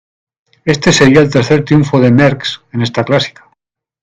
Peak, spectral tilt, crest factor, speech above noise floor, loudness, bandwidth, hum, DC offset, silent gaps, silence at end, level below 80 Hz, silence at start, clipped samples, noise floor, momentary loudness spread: 0 dBFS; -5.5 dB/octave; 12 dB; 54 dB; -11 LUFS; 9.4 kHz; none; under 0.1%; none; 0.75 s; -42 dBFS; 0.65 s; 0.3%; -63 dBFS; 12 LU